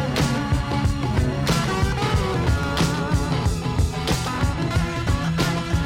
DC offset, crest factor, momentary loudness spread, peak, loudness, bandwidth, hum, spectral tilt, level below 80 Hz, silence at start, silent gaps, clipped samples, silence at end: under 0.1%; 14 dB; 2 LU; -8 dBFS; -22 LUFS; 16.5 kHz; none; -5.5 dB/octave; -30 dBFS; 0 s; none; under 0.1%; 0 s